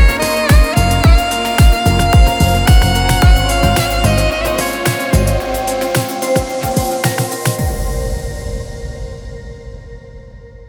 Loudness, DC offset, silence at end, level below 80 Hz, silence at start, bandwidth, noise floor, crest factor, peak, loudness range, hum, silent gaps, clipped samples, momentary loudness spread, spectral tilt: -14 LUFS; under 0.1%; 0 s; -16 dBFS; 0 s; over 20 kHz; -35 dBFS; 12 dB; 0 dBFS; 9 LU; none; none; under 0.1%; 16 LU; -5 dB/octave